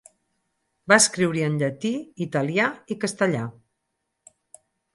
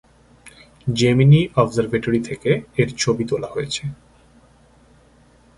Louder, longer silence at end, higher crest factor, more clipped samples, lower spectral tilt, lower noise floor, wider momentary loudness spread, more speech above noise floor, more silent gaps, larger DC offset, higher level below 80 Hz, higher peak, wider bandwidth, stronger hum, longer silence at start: second, -22 LUFS vs -19 LUFS; second, 1.45 s vs 1.65 s; about the same, 22 dB vs 20 dB; neither; second, -4 dB/octave vs -6 dB/octave; first, -78 dBFS vs -52 dBFS; about the same, 13 LU vs 12 LU; first, 56 dB vs 34 dB; neither; neither; second, -68 dBFS vs -48 dBFS; about the same, -2 dBFS vs -2 dBFS; about the same, 11.5 kHz vs 11.5 kHz; neither; first, 0.9 s vs 0.45 s